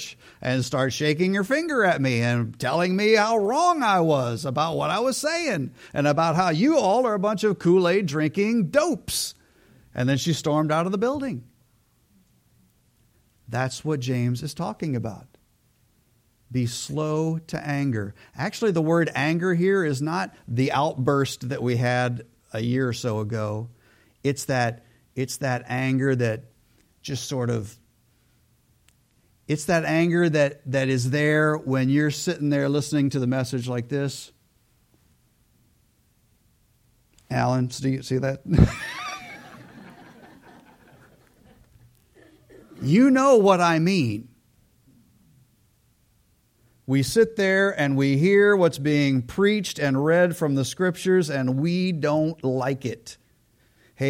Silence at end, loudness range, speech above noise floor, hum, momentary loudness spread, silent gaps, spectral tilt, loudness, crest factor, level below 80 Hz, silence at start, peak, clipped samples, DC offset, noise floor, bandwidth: 0 s; 9 LU; 41 dB; none; 11 LU; none; -6 dB/octave; -23 LUFS; 22 dB; -48 dBFS; 0 s; -2 dBFS; under 0.1%; under 0.1%; -64 dBFS; 16.5 kHz